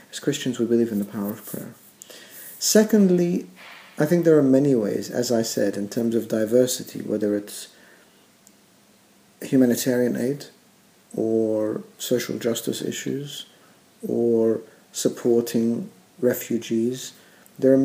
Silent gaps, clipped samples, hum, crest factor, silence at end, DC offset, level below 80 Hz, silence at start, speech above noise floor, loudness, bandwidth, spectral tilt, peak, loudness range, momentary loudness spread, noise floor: none; under 0.1%; none; 18 dB; 0 s; under 0.1%; -74 dBFS; 0.15 s; 34 dB; -23 LUFS; 16 kHz; -5 dB/octave; -4 dBFS; 6 LU; 19 LU; -56 dBFS